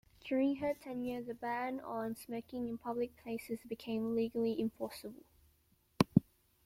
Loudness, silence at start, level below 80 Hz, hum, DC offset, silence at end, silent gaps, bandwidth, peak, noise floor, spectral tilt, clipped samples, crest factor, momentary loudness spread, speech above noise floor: -38 LUFS; 0.25 s; -66 dBFS; none; under 0.1%; 0.45 s; none; 16.5 kHz; -10 dBFS; -73 dBFS; -7 dB/octave; under 0.1%; 28 dB; 11 LU; 34 dB